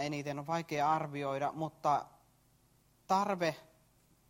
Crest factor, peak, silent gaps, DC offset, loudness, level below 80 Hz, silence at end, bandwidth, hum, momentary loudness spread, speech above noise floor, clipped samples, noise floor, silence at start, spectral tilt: 18 dB; -18 dBFS; none; under 0.1%; -35 LUFS; -74 dBFS; 0.65 s; 16 kHz; none; 6 LU; 35 dB; under 0.1%; -69 dBFS; 0 s; -5.5 dB/octave